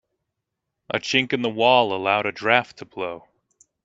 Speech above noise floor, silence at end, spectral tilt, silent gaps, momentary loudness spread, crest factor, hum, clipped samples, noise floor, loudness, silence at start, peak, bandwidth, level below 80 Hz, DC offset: 60 dB; 0.65 s; -4 dB/octave; none; 14 LU; 22 dB; none; under 0.1%; -81 dBFS; -21 LUFS; 0.9 s; 0 dBFS; 7.8 kHz; -68 dBFS; under 0.1%